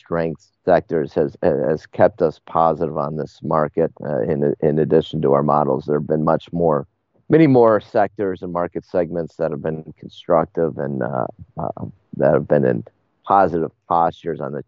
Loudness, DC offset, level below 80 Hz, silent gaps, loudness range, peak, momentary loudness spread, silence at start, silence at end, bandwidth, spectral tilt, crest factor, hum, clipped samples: -19 LUFS; under 0.1%; -52 dBFS; none; 5 LU; 0 dBFS; 11 LU; 0.1 s; 0.05 s; 7 kHz; -7 dB/octave; 18 dB; none; under 0.1%